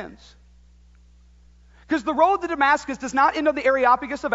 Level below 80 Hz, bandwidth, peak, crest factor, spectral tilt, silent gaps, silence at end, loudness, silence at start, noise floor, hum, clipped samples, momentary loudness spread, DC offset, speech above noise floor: -52 dBFS; 8 kHz; -4 dBFS; 18 dB; -4 dB/octave; none; 0 s; -21 LUFS; 0 s; -52 dBFS; 60 Hz at -50 dBFS; under 0.1%; 7 LU; under 0.1%; 31 dB